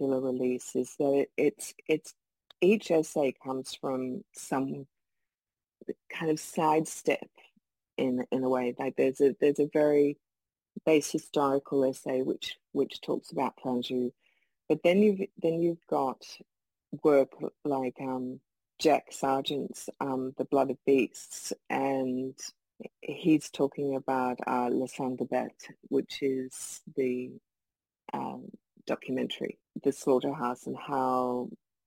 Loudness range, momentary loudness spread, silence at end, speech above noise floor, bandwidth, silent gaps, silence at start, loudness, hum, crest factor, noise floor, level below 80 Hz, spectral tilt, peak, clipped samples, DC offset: 6 LU; 14 LU; 0.3 s; over 60 dB; 16.5 kHz; none; 0 s; -30 LUFS; none; 18 dB; under -90 dBFS; -78 dBFS; -5 dB/octave; -12 dBFS; under 0.1%; under 0.1%